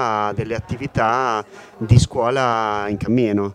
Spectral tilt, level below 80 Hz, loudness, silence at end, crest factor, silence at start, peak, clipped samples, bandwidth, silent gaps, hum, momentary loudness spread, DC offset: -6.5 dB/octave; -36 dBFS; -19 LUFS; 0 s; 18 dB; 0 s; 0 dBFS; under 0.1%; 10.5 kHz; none; none; 10 LU; under 0.1%